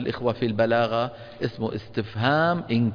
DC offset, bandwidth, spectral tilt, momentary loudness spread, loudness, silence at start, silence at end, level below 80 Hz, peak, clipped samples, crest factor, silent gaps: under 0.1%; 5.2 kHz; -8 dB/octave; 10 LU; -25 LUFS; 0 s; 0 s; -56 dBFS; -8 dBFS; under 0.1%; 16 dB; none